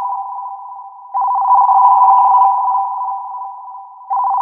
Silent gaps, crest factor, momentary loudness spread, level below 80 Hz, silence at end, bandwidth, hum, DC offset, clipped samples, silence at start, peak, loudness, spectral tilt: none; 14 dB; 22 LU; -84 dBFS; 0 s; 3.1 kHz; none; under 0.1%; under 0.1%; 0 s; 0 dBFS; -13 LUFS; -3.5 dB/octave